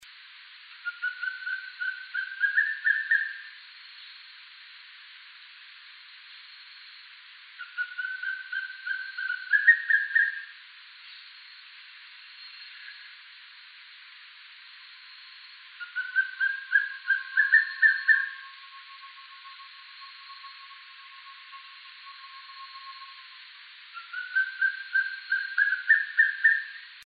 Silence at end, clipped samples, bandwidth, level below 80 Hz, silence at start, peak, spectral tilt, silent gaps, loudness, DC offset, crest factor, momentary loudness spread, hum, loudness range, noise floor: 0 s; under 0.1%; 5 kHz; under -90 dBFS; 0 s; -8 dBFS; 5.5 dB/octave; none; -25 LUFS; under 0.1%; 24 dB; 25 LU; none; 20 LU; -50 dBFS